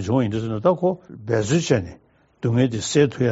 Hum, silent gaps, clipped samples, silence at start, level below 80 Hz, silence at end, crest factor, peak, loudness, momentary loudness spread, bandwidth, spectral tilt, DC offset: none; none; under 0.1%; 0 s; -54 dBFS; 0 s; 16 dB; -4 dBFS; -21 LUFS; 7 LU; 8 kHz; -6.5 dB/octave; under 0.1%